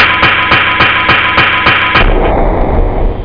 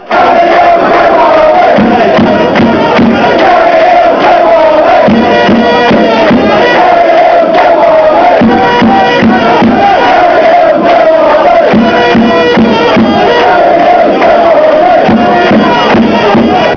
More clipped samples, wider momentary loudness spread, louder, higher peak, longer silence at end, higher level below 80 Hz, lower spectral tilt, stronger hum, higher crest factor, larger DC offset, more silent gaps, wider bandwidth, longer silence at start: first, 0.2% vs under 0.1%; first, 7 LU vs 1 LU; second, -8 LUFS vs -5 LUFS; about the same, 0 dBFS vs 0 dBFS; about the same, 0 s vs 0 s; first, -14 dBFS vs -34 dBFS; about the same, -6.5 dB/octave vs -6.5 dB/octave; neither; about the same, 8 dB vs 4 dB; first, 1% vs under 0.1%; neither; about the same, 5.2 kHz vs 5.4 kHz; about the same, 0 s vs 0 s